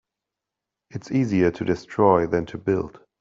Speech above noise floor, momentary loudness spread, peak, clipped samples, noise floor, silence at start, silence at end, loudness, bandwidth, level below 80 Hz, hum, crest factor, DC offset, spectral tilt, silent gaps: 64 dB; 15 LU; -4 dBFS; under 0.1%; -86 dBFS; 0.95 s; 0.3 s; -22 LUFS; 7.6 kHz; -54 dBFS; none; 20 dB; under 0.1%; -8 dB/octave; none